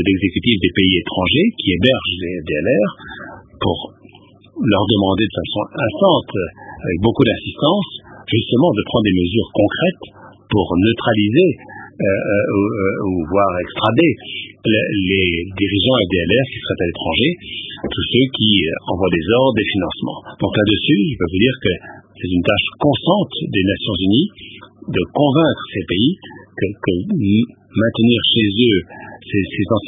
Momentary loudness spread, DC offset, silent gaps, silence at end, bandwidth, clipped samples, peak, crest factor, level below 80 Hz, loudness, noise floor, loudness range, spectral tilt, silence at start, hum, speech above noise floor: 11 LU; under 0.1%; none; 0 s; 3.9 kHz; under 0.1%; 0 dBFS; 16 dB; -38 dBFS; -17 LUFS; -45 dBFS; 2 LU; -9.5 dB/octave; 0 s; none; 29 dB